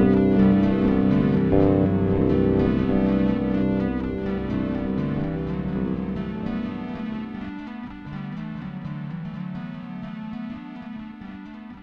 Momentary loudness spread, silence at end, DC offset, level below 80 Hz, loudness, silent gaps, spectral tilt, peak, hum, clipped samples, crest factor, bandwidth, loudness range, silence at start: 17 LU; 0 s; under 0.1%; -40 dBFS; -23 LUFS; none; -10.5 dB/octave; -6 dBFS; none; under 0.1%; 18 dB; 5.2 kHz; 13 LU; 0 s